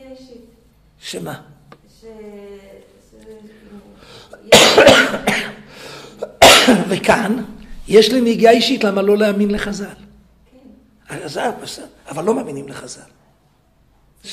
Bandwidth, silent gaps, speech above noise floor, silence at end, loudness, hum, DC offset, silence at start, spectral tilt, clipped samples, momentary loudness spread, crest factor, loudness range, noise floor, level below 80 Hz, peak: 15.5 kHz; none; 39 dB; 0 s; -12 LUFS; none; under 0.1%; 0.1 s; -3 dB/octave; under 0.1%; 26 LU; 18 dB; 16 LU; -56 dBFS; -44 dBFS; 0 dBFS